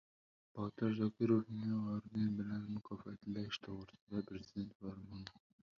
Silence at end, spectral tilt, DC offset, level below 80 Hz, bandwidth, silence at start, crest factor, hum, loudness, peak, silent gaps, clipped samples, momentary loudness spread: 0.4 s; -7 dB/octave; under 0.1%; -70 dBFS; 6.8 kHz; 0.55 s; 20 dB; none; -42 LUFS; -22 dBFS; 4.01-4.07 s, 4.75-4.80 s; under 0.1%; 15 LU